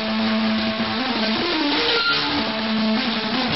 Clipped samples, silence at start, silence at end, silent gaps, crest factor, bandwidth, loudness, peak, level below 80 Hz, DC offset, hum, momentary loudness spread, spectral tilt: under 0.1%; 0 s; 0 s; none; 14 dB; 6 kHz; -20 LUFS; -8 dBFS; -52 dBFS; 0.4%; none; 4 LU; -1.5 dB/octave